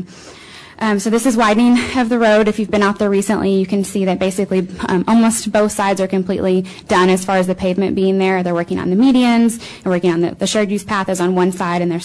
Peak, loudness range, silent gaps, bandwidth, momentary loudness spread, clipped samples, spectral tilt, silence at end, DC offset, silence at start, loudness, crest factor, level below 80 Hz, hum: -4 dBFS; 2 LU; none; 11 kHz; 6 LU; under 0.1%; -5.5 dB/octave; 0 s; under 0.1%; 0 s; -15 LUFS; 10 dB; -46 dBFS; none